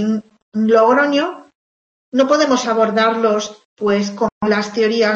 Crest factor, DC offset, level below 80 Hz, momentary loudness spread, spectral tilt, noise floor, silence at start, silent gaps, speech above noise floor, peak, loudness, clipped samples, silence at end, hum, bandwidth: 16 dB; under 0.1%; -60 dBFS; 10 LU; -4.5 dB/octave; under -90 dBFS; 0 s; 0.42-0.52 s, 1.55-2.12 s, 3.65-3.76 s, 4.32-4.41 s; over 75 dB; 0 dBFS; -16 LUFS; under 0.1%; 0 s; none; 7.8 kHz